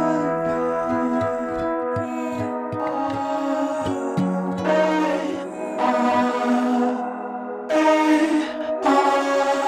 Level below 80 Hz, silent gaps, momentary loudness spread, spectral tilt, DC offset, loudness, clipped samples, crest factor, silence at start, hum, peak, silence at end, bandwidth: -56 dBFS; none; 9 LU; -6 dB/octave; under 0.1%; -22 LUFS; under 0.1%; 16 dB; 0 s; none; -6 dBFS; 0 s; 14 kHz